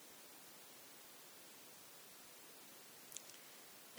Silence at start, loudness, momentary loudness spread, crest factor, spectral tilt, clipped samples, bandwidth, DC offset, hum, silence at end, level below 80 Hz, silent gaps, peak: 0 s; -56 LUFS; 4 LU; 32 dB; -0.5 dB/octave; under 0.1%; over 20 kHz; under 0.1%; none; 0 s; under -90 dBFS; none; -26 dBFS